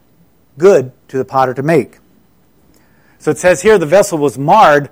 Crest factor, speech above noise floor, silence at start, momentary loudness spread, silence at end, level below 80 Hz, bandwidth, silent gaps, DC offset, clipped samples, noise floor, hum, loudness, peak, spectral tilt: 12 dB; 42 dB; 0.55 s; 13 LU; 0.05 s; -48 dBFS; 16 kHz; none; under 0.1%; under 0.1%; -52 dBFS; none; -11 LUFS; 0 dBFS; -5.5 dB/octave